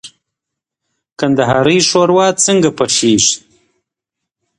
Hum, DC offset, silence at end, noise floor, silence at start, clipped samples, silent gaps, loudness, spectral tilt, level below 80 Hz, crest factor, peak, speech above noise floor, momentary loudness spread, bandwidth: none; under 0.1%; 1.2 s; -81 dBFS; 0.05 s; under 0.1%; 1.12-1.16 s; -11 LUFS; -3.5 dB/octave; -50 dBFS; 14 dB; 0 dBFS; 69 dB; 5 LU; 11.5 kHz